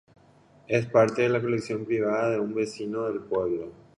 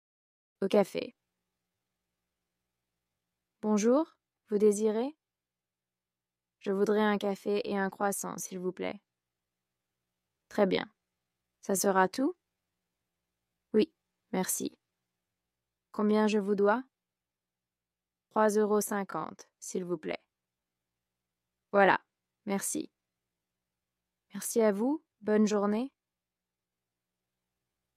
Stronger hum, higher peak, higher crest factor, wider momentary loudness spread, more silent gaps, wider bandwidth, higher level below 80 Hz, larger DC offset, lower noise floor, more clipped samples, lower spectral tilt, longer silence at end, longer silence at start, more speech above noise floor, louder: neither; first, -6 dBFS vs -10 dBFS; about the same, 20 dB vs 24 dB; second, 9 LU vs 13 LU; neither; second, 11 kHz vs 15.5 kHz; first, -64 dBFS vs -82 dBFS; neither; second, -57 dBFS vs under -90 dBFS; neither; first, -6.5 dB/octave vs -4.5 dB/octave; second, 0.25 s vs 2.1 s; about the same, 0.7 s vs 0.6 s; second, 31 dB vs over 61 dB; first, -26 LUFS vs -30 LUFS